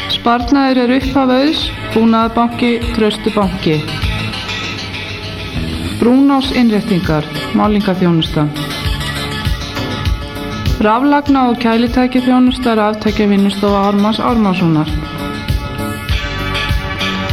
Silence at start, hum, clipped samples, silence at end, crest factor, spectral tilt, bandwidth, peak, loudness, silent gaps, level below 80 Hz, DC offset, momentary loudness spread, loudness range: 0 s; none; under 0.1%; 0 s; 12 dB; -6 dB/octave; 15.5 kHz; -2 dBFS; -14 LUFS; none; -26 dBFS; under 0.1%; 9 LU; 4 LU